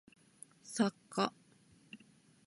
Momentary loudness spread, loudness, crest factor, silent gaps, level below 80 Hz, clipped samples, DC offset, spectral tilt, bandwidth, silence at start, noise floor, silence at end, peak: 22 LU; -37 LUFS; 24 dB; none; -84 dBFS; under 0.1%; under 0.1%; -4.5 dB/octave; 11.5 kHz; 0.65 s; -66 dBFS; 0.5 s; -16 dBFS